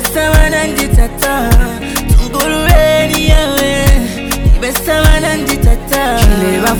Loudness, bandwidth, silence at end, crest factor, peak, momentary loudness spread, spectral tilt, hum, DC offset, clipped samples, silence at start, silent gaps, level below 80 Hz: -11 LUFS; over 20 kHz; 0 s; 10 dB; 0 dBFS; 4 LU; -4.5 dB/octave; none; under 0.1%; 0.1%; 0 s; none; -12 dBFS